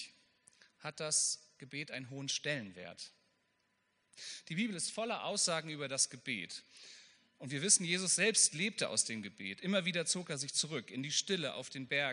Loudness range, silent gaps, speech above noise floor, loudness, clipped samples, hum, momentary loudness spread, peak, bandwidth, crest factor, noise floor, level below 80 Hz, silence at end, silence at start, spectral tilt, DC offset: 9 LU; none; 42 dB; -34 LUFS; under 0.1%; none; 19 LU; -14 dBFS; 10.5 kHz; 24 dB; -79 dBFS; -86 dBFS; 0 s; 0 s; -2 dB/octave; under 0.1%